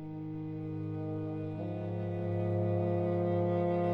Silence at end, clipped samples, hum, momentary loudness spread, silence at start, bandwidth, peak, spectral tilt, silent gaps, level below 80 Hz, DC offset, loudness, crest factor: 0 s; under 0.1%; none; 9 LU; 0 s; 4.2 kHz; -22 dBFS; -11 dB/octave; none; -66 dBFS; under 0.1%; -34 LUFS; 12 dB